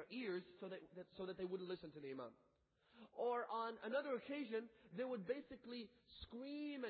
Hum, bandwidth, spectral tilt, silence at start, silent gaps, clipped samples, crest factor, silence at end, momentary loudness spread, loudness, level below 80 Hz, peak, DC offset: none; 4.8 kHz; -3.5 dB/octave; 0 s; none; under 0.1%; 18 dB; 0 s; 13 LU; -48 LUFS; -78 dBFS; -32 dBFS; under 0.1%